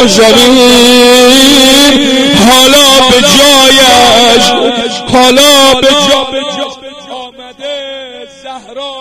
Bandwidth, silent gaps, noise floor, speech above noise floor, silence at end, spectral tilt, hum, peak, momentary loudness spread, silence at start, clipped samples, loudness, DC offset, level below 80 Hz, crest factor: over 20 kHz; none; -26 dBFS; 22 dB; 0 s; -2 dB/octave; 50 Hz at -50 dBFS; 0 dBFS; 19 LU; 0 s; 4%; -3 LUFS; 3%; -34 dBFS; 6 dB